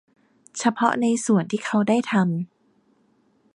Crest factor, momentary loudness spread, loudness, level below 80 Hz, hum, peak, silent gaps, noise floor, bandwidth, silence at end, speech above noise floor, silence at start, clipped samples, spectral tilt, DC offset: 20 dB; 9 LU; -22 LUFS; -72 dBFS; none; -4 dBFS; none; -63 dBFS; 11 kHz; 1.1 s; 42 dB; 0.55 s; under 0.1%; -5.5 dB/octave; under 0.1%